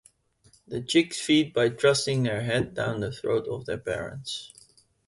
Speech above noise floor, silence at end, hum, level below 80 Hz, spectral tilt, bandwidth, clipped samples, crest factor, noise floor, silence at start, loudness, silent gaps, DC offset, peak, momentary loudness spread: 36 dB; 0.6 s; none; -58 dBFS; -4.5 dB/octave; 11.5 kHz; under 0.1%; 20 dB; -62 dBFS; 0.7 s; -26 LUFS; none; under 0.1%; -8 dBFS; 13 LU